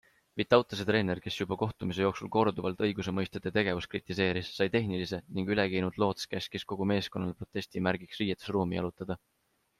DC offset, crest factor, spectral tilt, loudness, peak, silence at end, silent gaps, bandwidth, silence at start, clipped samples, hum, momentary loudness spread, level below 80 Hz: under 0.1%; 22 dB; -6 dB/octave; -32 LUFS; -8 dBFS; 0.6 s; none; 14 kHz; 0.35 s; under 0.1%; none; 8 LU; -62 dBFS